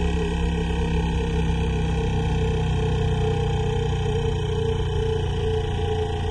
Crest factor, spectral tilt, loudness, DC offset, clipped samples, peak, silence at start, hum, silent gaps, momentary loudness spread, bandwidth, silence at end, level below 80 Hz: 12 dB; -7 dB/octave; -24 LUFS; under 0.1%; under 0.1%; -12 dBFS; 0 s; none; none; 2 LU; 11 kHz; 0 s; -28 dBFS